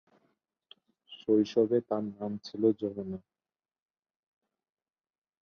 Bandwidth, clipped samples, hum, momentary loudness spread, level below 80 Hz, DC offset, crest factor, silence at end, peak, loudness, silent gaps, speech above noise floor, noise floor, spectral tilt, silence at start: 6.6 kHz; under 0.1%; none; 14 LU; -72 dBFS; under 0.1%; 20 dB; 2.25 s; -14 dBFS; -31 LUFS; none; over 61 dB; under -90 dBFS; -7.5 dB/octave; 1.1 s